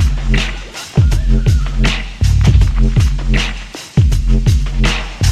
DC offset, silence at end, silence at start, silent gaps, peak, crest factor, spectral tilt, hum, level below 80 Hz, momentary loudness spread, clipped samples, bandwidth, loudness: under 0.1%; 0 s; 0 s; none; 0 dBFS; 12 dB; -5.5 dB/octave; none; -14 dBFS; 6 LU; under 0.1%; 12.5 kHz; -15 LUFS